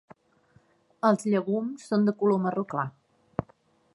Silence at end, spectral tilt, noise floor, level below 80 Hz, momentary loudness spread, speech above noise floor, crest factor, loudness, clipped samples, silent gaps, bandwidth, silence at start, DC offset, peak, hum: 0.5 s; -7.5 dB/octave; -63 dBFS; -64 dBFS; 13 LU; 38 dB; 20 dB; -27 LUFS; under 0.1%; none; 11.5 kHz; 1.05 s; under 0.1%; -8 dBFS; none